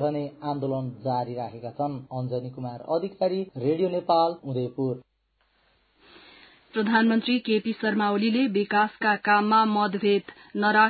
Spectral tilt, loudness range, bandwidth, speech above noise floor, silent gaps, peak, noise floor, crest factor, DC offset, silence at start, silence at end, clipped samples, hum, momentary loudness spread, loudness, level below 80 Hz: -10.5 dB/octave; 7 LU; 4.8 kHz; 45 dB; none; -6 dBFS; -70 dBFS; 18 dB; under 0.1%; 0 s; 0 s; under 0.1%; none; 11 LU; -25 LUFS; -68 dBFS